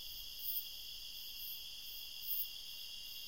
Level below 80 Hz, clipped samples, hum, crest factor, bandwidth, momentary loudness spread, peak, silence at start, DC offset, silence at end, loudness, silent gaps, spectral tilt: -66 dBFS; under 0.1%; none; 22 dB; 16 kHz; 8 LU; -24 dBFS; 0 s; 0.2%; 0 s; -43 LUFS; none; 1 dB/octave